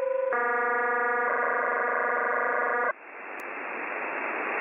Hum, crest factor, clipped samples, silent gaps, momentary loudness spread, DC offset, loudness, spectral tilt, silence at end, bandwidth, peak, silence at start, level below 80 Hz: none; 14 dB; under 0.1%; none; 9 LU; under 0.1%; -27 LUFS; -5 dB/octave; 0 s; 7 kHz; -14 dBFS; 0 s; -82 dBFS